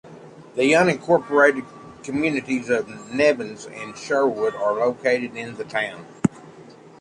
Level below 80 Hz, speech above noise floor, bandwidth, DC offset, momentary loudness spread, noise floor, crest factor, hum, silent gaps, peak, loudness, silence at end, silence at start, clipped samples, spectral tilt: -60 dBFS; 24 dB; 11 kHz; under 0.1%; 15 LU; -45 dBFS; 20 dB; none; none; -4 dBFS; -21 LUFS; 0.3 s; 0.05 s; under 0.1%; -5 dB/octave